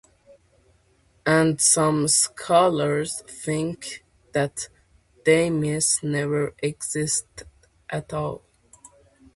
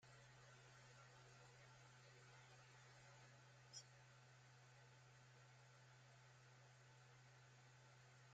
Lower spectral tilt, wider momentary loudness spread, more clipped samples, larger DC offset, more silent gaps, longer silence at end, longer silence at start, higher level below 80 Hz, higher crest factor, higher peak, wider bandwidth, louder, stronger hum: about the same, -3.5 dB/octave vs -3.5 dB/octave; first, 15 LU vs 3 LU; neither; neither; neither; first, 1 s vs 0 s; first, 1.25 s vs 0 s; first, -56 dBFS vs -90 dBFS; about the same, 20 dB vs 22 dB; first, -4 dBFS vs -46 dBFS; first, 12 kHz vs 8.8 kHz; first, -22 LUFS vs -67 LUFS; neither